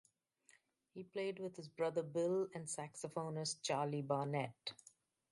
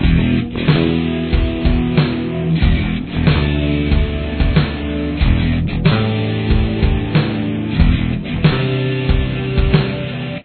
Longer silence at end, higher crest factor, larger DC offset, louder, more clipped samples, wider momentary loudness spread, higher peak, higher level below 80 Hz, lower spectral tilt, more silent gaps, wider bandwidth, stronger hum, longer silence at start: first, 0.6 s vs 0 s; first, 20 dB vs 14 dB; neither; second, -42 LUFS vs -17 LUFS; neither; first, 11 LU vs 5 LU; second, -24 dBFS vs 0 dBFS; second, -86 dBFS vs -20 dBFS; second, -4.5 dB/octave vs -10.5 dB/octave; neither; first, 11.5 kHz vs 4.5 kHz; neither; first, 0.95 s vs 0 s